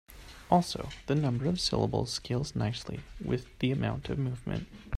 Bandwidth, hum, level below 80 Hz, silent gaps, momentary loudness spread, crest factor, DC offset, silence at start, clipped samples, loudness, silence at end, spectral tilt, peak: 14 kHz; none; -50 dBFS; none; 11 LU; 22 dB; under 0.1%; 0.1 s; under 0.1%; -32 LUFS; 0 s; -6 dB/octave; -10 dBFS